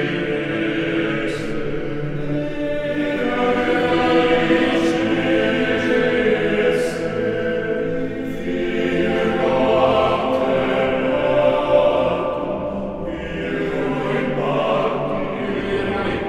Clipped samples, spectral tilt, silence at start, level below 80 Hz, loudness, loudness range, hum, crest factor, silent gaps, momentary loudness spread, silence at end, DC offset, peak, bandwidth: under 0.1%; -6.5 dB/octave; 0 s; -42 dBFS; -20 LUFS; 5 LU; none; 16 dB; none; 9 LU; 0 s; under 0.1%; -4 dBFS; 12 kHz